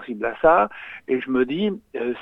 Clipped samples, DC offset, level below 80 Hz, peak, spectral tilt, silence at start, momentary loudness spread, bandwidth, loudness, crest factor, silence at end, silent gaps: under 0.1%; under 0.1%; -52 dBFS; -4 dBFS; -8 dB/octave; 0 s; 11 LU; 4 kHz; -22 LUFS; 18 dB; 0 s; none